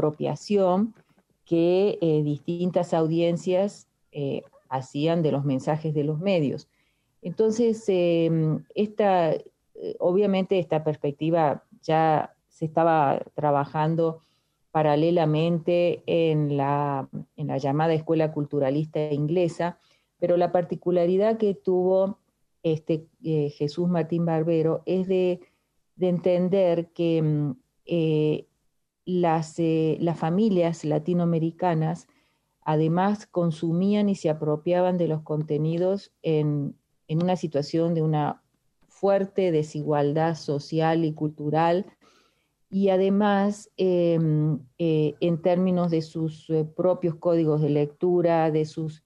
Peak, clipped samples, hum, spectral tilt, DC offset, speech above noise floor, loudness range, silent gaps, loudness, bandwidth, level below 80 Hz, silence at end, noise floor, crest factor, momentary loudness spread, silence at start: -8 dBFS; under 0.1%; none; -8 dB/octave; under 0.1%; 49 dB; 2 LU; none; -25 LUFS; 9.8 kHz; -68 dBFS; 0.1 s; -73 dBFS; 16 dB; 9 LU; 0 s